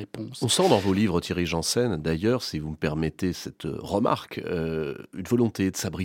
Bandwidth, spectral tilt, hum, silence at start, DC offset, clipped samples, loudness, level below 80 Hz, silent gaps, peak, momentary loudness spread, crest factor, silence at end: 17 kHz; -5 dB/octave; none; 0 s; under 0.1%; under 0.1%; -26 LUFS; -48 dBFS; none; -4 dBFS; 11 LU; 22 dB; 0 s